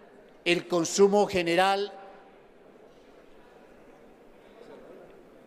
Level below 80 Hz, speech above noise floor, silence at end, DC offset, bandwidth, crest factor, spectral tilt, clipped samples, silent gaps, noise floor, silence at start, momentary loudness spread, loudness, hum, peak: -62 dBFS; 30 dB; 0.55 s; under 0.1%; 15 kHz; 22 dB; -4 dB/octave; under 0.1%; none; -54 dBFS; 0.45 s; 26 LU; -25 LUFS; none; -8 dBFS